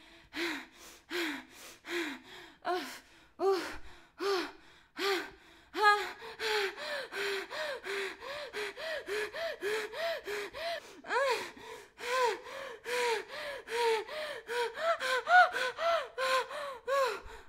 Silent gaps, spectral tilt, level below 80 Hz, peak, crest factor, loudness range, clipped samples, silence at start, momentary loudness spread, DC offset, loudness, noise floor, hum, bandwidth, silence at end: none; -1.5 dB/octave; -68 dBFS; -12 dBFS; 22 dB; 7 LU; under 0.1%; 0 s; 14 LU; under 0.1%; -34 LUFS; -55 dBFS; none; 16 kHz; 0 s